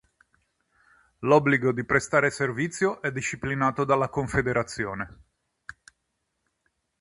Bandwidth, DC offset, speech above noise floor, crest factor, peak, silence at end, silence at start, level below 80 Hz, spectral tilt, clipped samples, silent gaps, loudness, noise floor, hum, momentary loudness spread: 11.5 kHz; under 0.1%; 53 dB; 22 dB; -6 dBFS; 1.9 s; 1.2 s; -52 dBFS; -5.5 dB/octave; under 0.1%; none; -25 LUFS; -78 dBFS; none; 16 LU